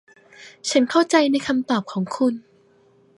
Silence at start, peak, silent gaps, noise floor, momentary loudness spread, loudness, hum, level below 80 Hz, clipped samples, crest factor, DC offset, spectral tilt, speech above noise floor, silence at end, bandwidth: 0.4 s; -2 dBFS; none; -56 dBFS; 10 LU; -21 LUFS; none; -68 dBFS; under 0.1%; 20 dB; under 0.1%; -4 dB/octave; 36 dB; 0.8 s; 11.5 kHz